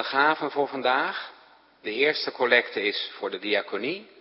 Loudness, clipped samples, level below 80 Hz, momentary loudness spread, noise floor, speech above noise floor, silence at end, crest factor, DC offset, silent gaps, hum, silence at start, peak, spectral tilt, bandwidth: -25 LUFS; under 0.1%; -80 dBFS; 11 LU; -55 dBFS; 29 dB; 0.15 s; 22 dB; under 0.1%; none; none; 0 s; -4 dBFS; -7 dB/octave; 5.8 kHz